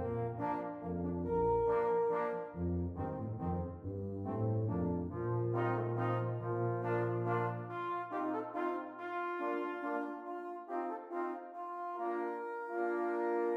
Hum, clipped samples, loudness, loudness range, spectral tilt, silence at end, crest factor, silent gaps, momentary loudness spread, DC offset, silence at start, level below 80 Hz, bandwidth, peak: none; under 0.1%; -37 LUFS; 4 LU; -10 dB/octave; 0 s; 14 dB; none; 9 LU; under 0.1%; 0 s; -60 dBFS; 5.2 kHz; -24 dBFS